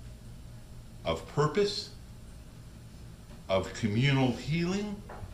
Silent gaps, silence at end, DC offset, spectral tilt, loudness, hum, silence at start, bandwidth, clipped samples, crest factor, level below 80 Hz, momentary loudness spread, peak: none; 0 s; under 0.1%; -6 dB/octave; -31 LUFS; none; 0 s; 15 kHz; under 0.1%; 18 dB; -50 dBFS; 22 LU; -14 dBFS